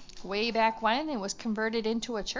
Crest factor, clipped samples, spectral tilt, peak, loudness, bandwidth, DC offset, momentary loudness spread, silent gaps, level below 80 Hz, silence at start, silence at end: 18 dB; under 0.1%; -3.5 dB/octave; -12 dBFS; -30 LUFS; 7.8 kHz; under 0.1%; 7 LU; none; -56 dBFS; 0 s; 0 s